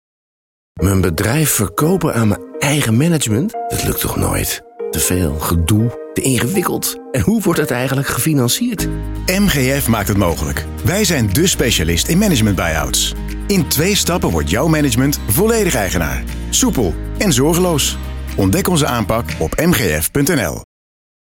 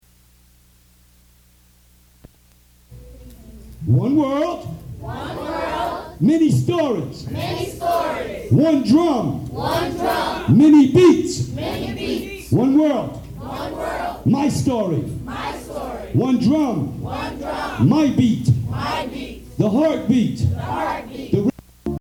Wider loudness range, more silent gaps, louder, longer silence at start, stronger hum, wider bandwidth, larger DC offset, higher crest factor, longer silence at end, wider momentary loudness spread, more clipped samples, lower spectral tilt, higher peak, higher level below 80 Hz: second, 2 LU vs 8 LU; neither; first, -15 LUFS vs -19 LUFS; second, 0.75 s vs 2.9 s; second, none vs 60 Hz at -45 dBFS; about the same, 17 kHz vs 17 kHz; neither; about the same, 14 dB vs 16 dB; first, 0.75 s vs 0 s; second, 6 LU vs 14 LU; neither; second, -4.5 dB/octave vs -7 dB/octave; about the same, -2 dBFS vs -2 dBFS; first, -28 dBFS vs -42 dBFS